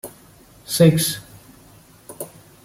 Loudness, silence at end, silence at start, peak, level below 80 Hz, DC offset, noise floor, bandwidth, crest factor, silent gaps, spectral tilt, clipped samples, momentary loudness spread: -18 LUFS; 0.4 s; 0.05 s; -2 dBFS; -56 dBFS; under 0.1%; -49 dBFS; 16.5 kHz; 20 dB; none; -5 dB/octave; under 0.1%; 23 LU